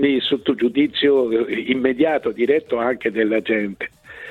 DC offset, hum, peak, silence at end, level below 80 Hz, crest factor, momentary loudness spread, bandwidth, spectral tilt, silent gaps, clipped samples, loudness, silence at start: under 0.1%; none; -4 dBFS; 0 s; -58 dBFS; 14 dB; 6 LU; 4.5 kHz; -6.5 dB/octave; none; under 0.1%; -19 LUFS; 0 s